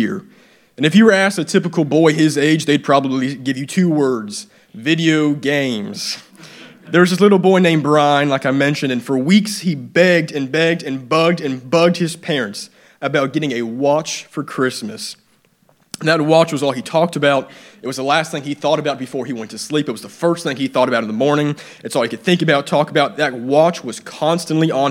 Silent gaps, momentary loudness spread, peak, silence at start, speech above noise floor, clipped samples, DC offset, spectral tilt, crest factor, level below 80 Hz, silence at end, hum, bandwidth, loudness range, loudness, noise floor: none; 12 LU; 0 dBFS; 0 s; 40 dB; under 0.1%; under 0.1%; -5.5 dB/octave; 16 dB; -68 dBFS; 0 s; none; 16.5 kHz; 5 LU; -16 LUFS; -56 dBFS